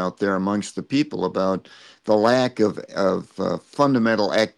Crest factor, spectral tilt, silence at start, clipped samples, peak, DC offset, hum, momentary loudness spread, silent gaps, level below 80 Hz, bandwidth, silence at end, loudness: 16 dB; -6 dB/octave; 0 s; under 0.1%; -4 dBFS; under 0.1%; none; 8 LU; none; -66 dBFS; 11.5 kHz; 0.1 s; -22 LUFS